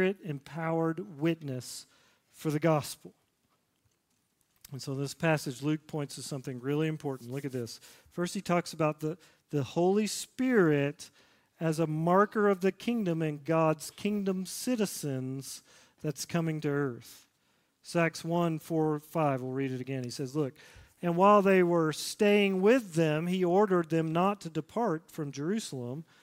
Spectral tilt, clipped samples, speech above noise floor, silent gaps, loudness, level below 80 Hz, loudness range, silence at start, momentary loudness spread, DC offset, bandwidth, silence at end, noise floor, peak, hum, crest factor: -6 dB/octave; under 0.1%; 45 dB; none; -30 LUFS; -72 dBFS; 9 LU; 0 s; 14 LU; under 0.1%; 16 kHz; 0.2 s; -75 dBFS; -10 dBFS; none; 20 dB